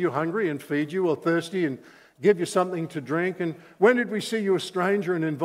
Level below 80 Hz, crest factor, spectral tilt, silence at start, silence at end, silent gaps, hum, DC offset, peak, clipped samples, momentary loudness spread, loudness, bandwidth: -76 dBFS; 20 dB; -6 dB/octave; 0 s; 0 s; none; none; under 0.1%; -6 dBFS; under 0.1%; 7 LU; -25 LUFS; 15.5 kHz